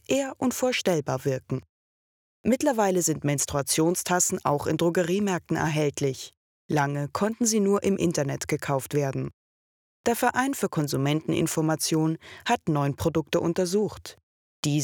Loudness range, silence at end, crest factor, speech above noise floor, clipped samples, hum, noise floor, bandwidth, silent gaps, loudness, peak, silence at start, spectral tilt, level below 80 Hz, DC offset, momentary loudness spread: 2 LU; 0 s; 18 dB; over 65 dB; under 0.1%; none; under -90 dBFS; 19.5 kHz; 1.69-2.44 s, 6.37-6.69 s, 9.33-10.04 s, 14.23-14.63 s; -26 LUFS; -8 dBFS; 0.1 s; -4.5 dB/octave; -58 dBFS; under 0.1%; 8 LU